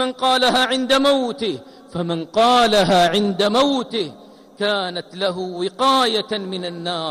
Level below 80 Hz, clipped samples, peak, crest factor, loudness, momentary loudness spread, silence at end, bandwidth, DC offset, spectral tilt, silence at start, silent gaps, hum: -54 dBFS; under 0.1%; -6 dBFS; 12 dB; -18 LUFS; 11 LU; 0 s; 15.5 kHz; under 0.1%; -4 dB/octave; 0 s; none; none